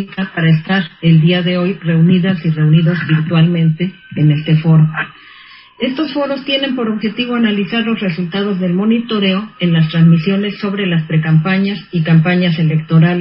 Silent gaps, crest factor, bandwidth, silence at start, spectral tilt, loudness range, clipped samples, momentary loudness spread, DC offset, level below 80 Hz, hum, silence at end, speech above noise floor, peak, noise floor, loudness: none; 12 dB; 5.6 kHz; 0 s; -12.5 dB/octave; 4 LU; under 0.1%; 7 LU; under 0.1%; -52 dBFS; none; 0 s; 27 dB; 0 dBFS; -39 dBFS; -14 LUFS